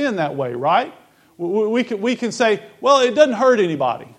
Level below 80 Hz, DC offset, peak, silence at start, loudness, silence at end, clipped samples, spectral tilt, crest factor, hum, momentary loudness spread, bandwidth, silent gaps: -70 dBFS; under 0.1%; 0 dBFS; 0 s; -18 LUFS; 0.1 s; under 0.1%; -4.5 dB/octave; 18 dB; none; 8 LU; 10.5 kHz; none